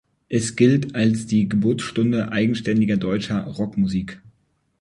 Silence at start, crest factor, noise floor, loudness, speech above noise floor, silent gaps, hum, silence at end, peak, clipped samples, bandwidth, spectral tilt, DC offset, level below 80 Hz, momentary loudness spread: 0.3 s; 18 dB; -65 dBFS; -21 LUFS; 45 dB; none; none; 0.65 s; -4 dBFS; under 0.1%; 11.5 kHz; -6.5 dB/octave; under 0.1%; -50 dBFS; 8 LU